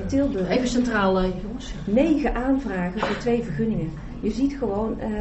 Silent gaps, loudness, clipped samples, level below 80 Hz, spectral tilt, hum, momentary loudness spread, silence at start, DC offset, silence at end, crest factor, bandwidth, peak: none; -24 LUFS; under 0.1%; -36 dBFS; -6.5 dB/octave; none; 8 LU; 0 s; under 0.1%; 0 s; 16 dB; 8.2 kHz; -8 dBFS